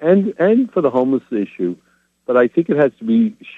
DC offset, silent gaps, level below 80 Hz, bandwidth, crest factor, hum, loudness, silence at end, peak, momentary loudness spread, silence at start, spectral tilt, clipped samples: under 0.1%; none; -66 dBFS; 4.1 kHz; 16 dB; none; -17 LUFS; 0.05 s; -2 dBFS; 9 LU; 0 s; -9.5 dB/octave; under 0.1%